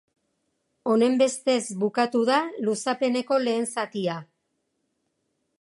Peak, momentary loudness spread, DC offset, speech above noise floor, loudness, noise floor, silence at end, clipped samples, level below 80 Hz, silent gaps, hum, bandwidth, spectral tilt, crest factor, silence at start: -8 dBFS; 8 LU; under 0.1%; 52 dB; -24 LUFS; -76 dBFS; 1.4 s; under 0.1%; -80 dBFS; none; none; 11.5 kHz; -4 dB/octave; 18 dB; 0.85 s